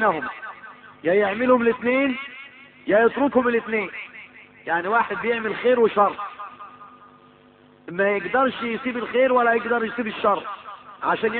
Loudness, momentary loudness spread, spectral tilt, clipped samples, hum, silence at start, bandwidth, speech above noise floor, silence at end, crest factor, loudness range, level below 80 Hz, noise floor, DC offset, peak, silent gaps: -22 LUFS; 19 LU; -9.5 dB/octave; under 0.1%; none; 0 s; 4.4 kHz; 31 dB; 0 s; 18 dB; 3 LU; -62 dBFS; -52 dBFS; under 0.1%; -6 dBFS; none